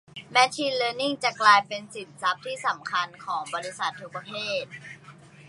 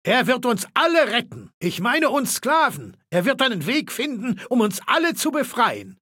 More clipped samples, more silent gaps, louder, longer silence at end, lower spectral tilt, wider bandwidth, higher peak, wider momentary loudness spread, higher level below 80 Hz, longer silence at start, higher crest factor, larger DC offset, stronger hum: neither; second, none vs 1.54-1.61 s; second, -25 LUFS vs -21 LUFS; about the same, 0.05 s vs 0.1 s; second, -2 dB/octave vs -3.5 dB/octave; second, 11.5 kHz vs 17 kHz; about the same, -2 dBFS vs -4 dBFS; first, 19 LU vs 8 LU; about the same, -74 dBFS vs -70 dBFS; about the same, 0.15 s vs 0.05 s; first, 24 dB vs 16 dB; neither; neither